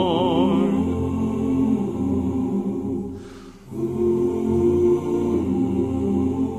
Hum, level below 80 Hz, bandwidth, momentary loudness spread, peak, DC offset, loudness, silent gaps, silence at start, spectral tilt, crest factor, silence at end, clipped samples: none; -40 dBFS; 13 kHz; 10 LU; -8 dBFS; under 0.1%; -22 LUFS; none; 0 s; -8.5 dB/octave; 14 dB; 0 s; under 0.1%